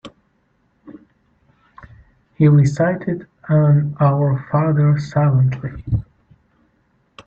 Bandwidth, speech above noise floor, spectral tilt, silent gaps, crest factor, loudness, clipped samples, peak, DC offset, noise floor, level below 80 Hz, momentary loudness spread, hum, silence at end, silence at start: 7.4 kHz; 47 dB; -9.5 dB/octave; none; 16 dB; -17 LUFS; under 0.1%; -2 dBFS; under 0.1%; -63 dBFS; -44 dBFS; 11 LU; none; 0.05 s; 0.05 s